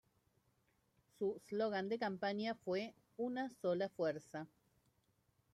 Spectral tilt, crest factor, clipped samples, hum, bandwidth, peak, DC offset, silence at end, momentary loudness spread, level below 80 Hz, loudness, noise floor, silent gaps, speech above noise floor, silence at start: -6 dB/octave; 16 dB; under 0.1%; none; 13.5 kHz; -26 dBFS; under 0.1%; 1.05 s; 10 LU; -84 dBFS; -42 LUFS; -79 dBFS; none; 38 dB; 1.2 s